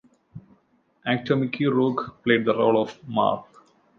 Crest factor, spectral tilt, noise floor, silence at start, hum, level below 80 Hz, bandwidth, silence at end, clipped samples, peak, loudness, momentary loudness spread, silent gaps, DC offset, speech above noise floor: 18 dB; -8 dB/octave; -64 dBFS; 0.35 s; none; -66 dBFS; 6.8 kHz; 0.55 s; under 0.1%; -6 dBFS; -23 LUFS; 7 LU; none; under 0.1%; 42 dB